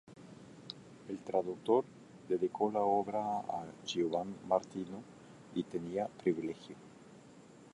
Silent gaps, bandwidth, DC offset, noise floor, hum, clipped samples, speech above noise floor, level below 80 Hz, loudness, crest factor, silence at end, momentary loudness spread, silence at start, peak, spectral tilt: none; 11.5 kHz; under 0.1%; -57 dBFS; none; under 0.1%; 22 dB; -74 dBFS; -36 LUFS; 22 dB; 0.05 s; 23 LU; 0.1 s; -16 dBFS; -6 dB/octave